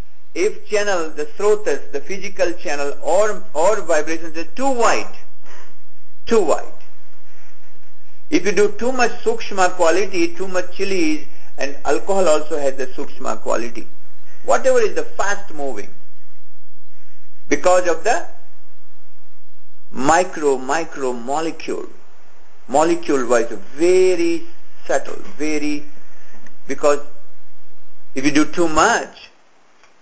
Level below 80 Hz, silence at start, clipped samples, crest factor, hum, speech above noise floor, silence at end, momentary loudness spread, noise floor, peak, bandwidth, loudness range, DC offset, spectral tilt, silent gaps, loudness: -52 dBFS; 0 s; under 0.1%; 18 dB; none; 40 dB; 0 s; 13 LU; -58 dBFS; 0 dBFS; 8 kHz; 4 LU; 20%; -4 dB/octave; none; -19 LUFS